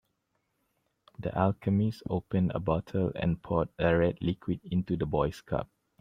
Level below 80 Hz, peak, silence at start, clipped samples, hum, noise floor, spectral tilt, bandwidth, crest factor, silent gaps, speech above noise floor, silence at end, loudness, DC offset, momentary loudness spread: -52 dBFS; -10 dBFS; 1.2 s; under 0.1%; none; -78 dBFS; -9 dB/octave; 9.8 kHz; 20 dB; none; 49 dB; 0.35 s; -30 LUFS; under 0.1%; 8 LU